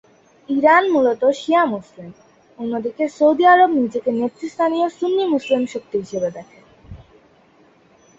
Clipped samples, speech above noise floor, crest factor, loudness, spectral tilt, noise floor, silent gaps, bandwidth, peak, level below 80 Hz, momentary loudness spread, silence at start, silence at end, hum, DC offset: under 0.1%; 36 dB; 18 dB; -18 LUFS; -5.5 dB/octave; -53 dBFS; none; 8 kHz; -2 dBFS; -56 dBFS; 13 LU; 0.5 s; 1.25 s; none; under 0.1%